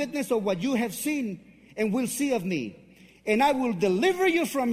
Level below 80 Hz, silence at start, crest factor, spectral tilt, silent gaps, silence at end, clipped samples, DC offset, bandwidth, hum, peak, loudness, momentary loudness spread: -64 dBFS; 0 s; 16 dB; -4.5 dB/octave; none; 0 s; under 0.1%; under 0.1%; 16 kHz; none; -10 dBFS; -26 LUFS; 12 LU